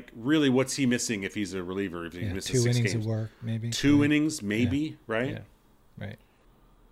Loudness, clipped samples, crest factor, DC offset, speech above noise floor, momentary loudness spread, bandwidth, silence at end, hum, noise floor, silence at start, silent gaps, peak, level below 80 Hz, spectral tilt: -27 LUFS; under 0.1%; 16 dB; under 0.1%; 32 dB; 11 LU; 15.5 kHz; 0.75 s; none; -60 dBFS; 0 s; none; -12 dBFS; -54 dBFS; -5 dB/octave